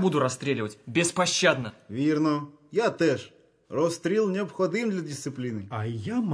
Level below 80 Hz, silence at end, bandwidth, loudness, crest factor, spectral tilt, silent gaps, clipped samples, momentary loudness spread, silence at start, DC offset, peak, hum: -70 dBFS; 0 s; 11 kHz; -27 LUFS; 18 dB; -4.5 dB/octave; none; under 0.1%; 9 LU; 0 s; under 0.1%; -8 dBFS; none